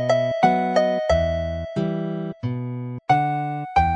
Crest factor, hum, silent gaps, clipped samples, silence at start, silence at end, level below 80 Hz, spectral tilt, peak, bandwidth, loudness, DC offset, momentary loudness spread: 18 dB; none; none; under 0.1%; 0 s; 0 s; -38 dBFS; -7 dB/octave; -4 dBFS; 9.8 kHz; -22 LUFS; under 0.1%; 9 LU